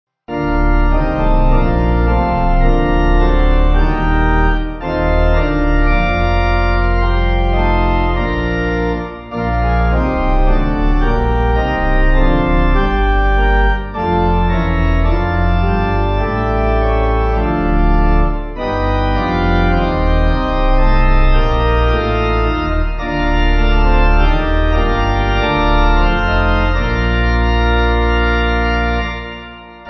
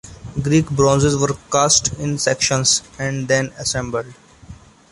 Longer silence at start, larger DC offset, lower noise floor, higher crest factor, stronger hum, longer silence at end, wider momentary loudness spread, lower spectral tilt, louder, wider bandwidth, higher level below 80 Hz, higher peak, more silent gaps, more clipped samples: first, 0.3 s vs 0.05 s; neither; second, -33 dBFS vs -41 dBFS; second, 12 dB vs 18 dB; neither; second, 0 s vs 0.35 s; second, 3 LU vs 11 LU; first, -8 dB/octave vs -3.5 dB/octave; about the same, -15 LUFS vs -17 LUFS; second, 6 kHz vs 11.5 kHz; first, -14 dBFS vs -42 dBFS; about the same, 0 dBFS vs -2 dBFS; neither; neither